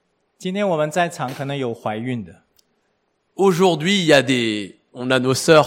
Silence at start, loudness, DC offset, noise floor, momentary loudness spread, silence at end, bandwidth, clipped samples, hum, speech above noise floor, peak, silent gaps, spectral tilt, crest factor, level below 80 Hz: 0.4 s; -19 LUFS; under 0.1%; -68 dBFS; 16 LU; 0 s; 16.5 kHz; under 0.1%; none; 50 dB; 0 dBFS; none; -4.5 dB/octave; 18 dB; -62 dBFS